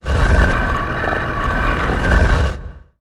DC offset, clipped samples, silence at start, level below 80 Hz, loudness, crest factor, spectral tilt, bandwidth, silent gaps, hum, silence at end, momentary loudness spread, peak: under 0.1%; under 0.1%; 0.05 s; -20 dBFS; -17 LUFS; 14 dB; -6 dB/octave; 11.5 kHz; none; none; 0.2 s; 6 LU; -2 dBFS